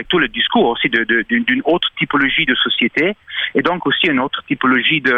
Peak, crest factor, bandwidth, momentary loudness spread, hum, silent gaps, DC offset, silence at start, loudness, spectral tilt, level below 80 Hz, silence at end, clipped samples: -2 dBFS; 14 dB; 6.4 kHz; 4 LU; none; none; under 0.1%; 0 s; -15 LUFS; -6.5 dB/octave; -48 dBFS; 0 s; under 0.1%